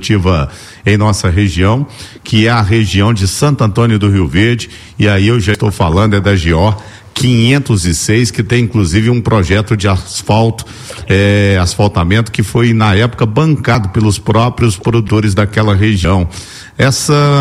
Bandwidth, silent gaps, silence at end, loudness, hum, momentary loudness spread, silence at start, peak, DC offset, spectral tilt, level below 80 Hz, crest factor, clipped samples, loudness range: 14 kHz; none; 0 s; -11 LUFS; none; 6 LU; 0 s; 0 dBFS; under 0.1%; -5.5 dB/octave; -28 dBFS; 10 dB; under 0.1%; 1 LU